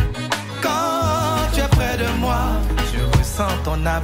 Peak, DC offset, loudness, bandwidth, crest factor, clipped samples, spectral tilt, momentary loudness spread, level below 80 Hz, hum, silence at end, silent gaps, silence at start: -2 dBFS; under 0.1%; -20 LUFS; 16.5 kHz; 16 dB; under 0.1%; -5 dB/octave; 4 LU; -24 dBFS; none; 0 s; none; 0 s